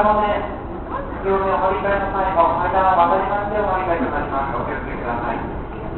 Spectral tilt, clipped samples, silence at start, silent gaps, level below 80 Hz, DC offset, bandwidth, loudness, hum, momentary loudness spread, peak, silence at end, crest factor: -11.5 dB/octave; under 0.1%; 0 s; none; -34 dBFS; under 0.1%; 4.3 kHz; -20 LUFS; none; 11 LU; -4 dBFS; 0 s; 16 dB